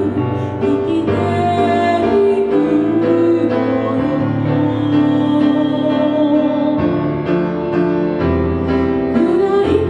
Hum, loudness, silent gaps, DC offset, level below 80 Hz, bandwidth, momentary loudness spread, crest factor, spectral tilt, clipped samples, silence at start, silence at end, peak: none; -15 LUFS; none; under 0.1%; -38 dBFS; 9.2 kHz; 4 LU; 14 dB; -8.5 dB/octave; under 0.1%; 0 s; 0 s; 0 dBFS